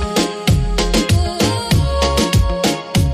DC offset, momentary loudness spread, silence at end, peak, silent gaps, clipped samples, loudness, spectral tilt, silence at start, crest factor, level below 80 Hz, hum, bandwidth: under 0.1%; 2 LU; 0 s; -2 dBFS; none; under 0.1%; -16 LUFS; -5 dB/octave; 0 s; 12 dB; -22 dBFS; none; 15.5 kHz